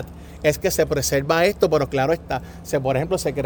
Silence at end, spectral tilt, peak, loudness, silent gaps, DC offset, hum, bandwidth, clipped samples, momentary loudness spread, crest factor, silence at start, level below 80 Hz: 0 s; -4.5 dB/octave; -4 dBFS; -21 LUFS; none; under 0.1%; none; over 20 kHz; under 0.1%; 8 LU; 16 dB; 0 s; -40 dBFS